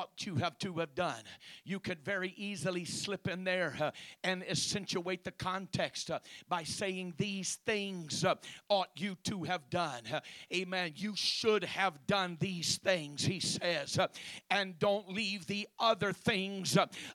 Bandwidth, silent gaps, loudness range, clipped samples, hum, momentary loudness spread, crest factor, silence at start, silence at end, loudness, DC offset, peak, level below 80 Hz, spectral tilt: 16.5 kHz; none; 4 LU; under 0.1%; none; 8 LU; 22 dB; 0 s; 0 s; -35 LUFS; under 0.1%; -14 dBFS; -70 dBFS; -3.5 dB/octave